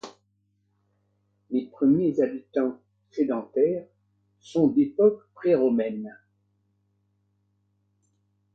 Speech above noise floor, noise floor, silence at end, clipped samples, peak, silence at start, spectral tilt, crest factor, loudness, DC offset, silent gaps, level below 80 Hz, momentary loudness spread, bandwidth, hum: 48 dB; -71 dBFS; 2.4 s; under 0.1%; -10 dBFS; 0.05 s; -8.5 dB/octave; 18 dB; -25 LUFS; under 0.1%; none; -70 dBFS; 10 LU; 7.4 kHz; 50 Hz at -55 dBFS